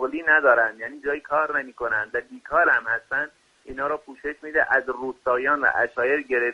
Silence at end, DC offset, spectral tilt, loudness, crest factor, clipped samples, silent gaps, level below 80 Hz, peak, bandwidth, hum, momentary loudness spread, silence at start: 0 s; under 0.1%; -5.5 dB/octave; -23 LUFS; 18 dB; under 0.1%; none; -58 dBFS; -4 dBFS; 10.5 kHz; none; 12 LU; 0 s